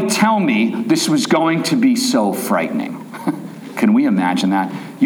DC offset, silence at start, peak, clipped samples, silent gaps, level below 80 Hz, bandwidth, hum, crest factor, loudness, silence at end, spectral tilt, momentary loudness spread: under 0.1%; 0 s; -2 dBFS; under 0.1%; none; -72 dBFS; over 20 kHz; none; 14 dB; -16 LUFS; 0 s; -4.5 dB/octave; 10 LU